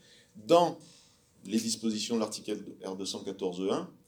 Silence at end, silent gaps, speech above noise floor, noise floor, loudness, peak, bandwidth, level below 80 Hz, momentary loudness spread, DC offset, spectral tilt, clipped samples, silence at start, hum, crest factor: 0.15 s; none; 30 dB; -61 dBFS; -31 LUFS; -8 dBFS; 20 kHz; -78 dBFS; 16 LU; under 0.1%; -4 dB/octave; under 0.1%; 0.35 s; none; 24 dB